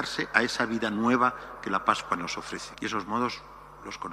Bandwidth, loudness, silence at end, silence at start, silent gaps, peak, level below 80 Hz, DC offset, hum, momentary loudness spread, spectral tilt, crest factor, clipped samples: 14.5 kHz; -28 LUFS; 0 s; 0 s; none; -4 dBFS; -58 dBFS; under 0.1%; none; 14 LU; -4 dB/octave; 26 dB; under 0.1%